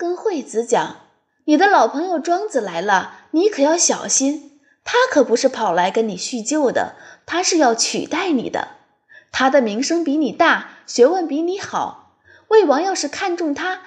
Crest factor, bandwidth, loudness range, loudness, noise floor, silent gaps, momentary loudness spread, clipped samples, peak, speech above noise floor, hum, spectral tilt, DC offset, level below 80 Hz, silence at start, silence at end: 16 dB; 10.5 kHz; 2 LU; -18 LUFS; -51 dBFS; none; 10 LU; under 0.1%; -2 dBFS; 34 dB; none; -2.5 dB/octave; under 0.1%; -66 dBFS; 0 s; 0.05 s